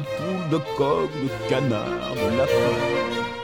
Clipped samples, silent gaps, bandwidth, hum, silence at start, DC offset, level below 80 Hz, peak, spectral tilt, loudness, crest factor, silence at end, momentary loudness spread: under 0.1%; none; 19 kHz; none; 0 s; 0.2%; -50 dBFS; -8 dBFS; -6 dB/octave; -24 LUFS; 14 dB; 0 s; 6 LU